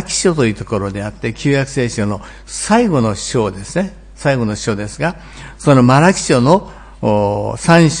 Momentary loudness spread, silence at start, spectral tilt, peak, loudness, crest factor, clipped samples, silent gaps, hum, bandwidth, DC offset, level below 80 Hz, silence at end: 12 LU; 0 s; -5.5 dB/octave; 0 dBFS; -15 LUFS; 14 dB; 0.2%; none; none; 10.5 kHz; under 0.1%; -38 dBFS; 0 s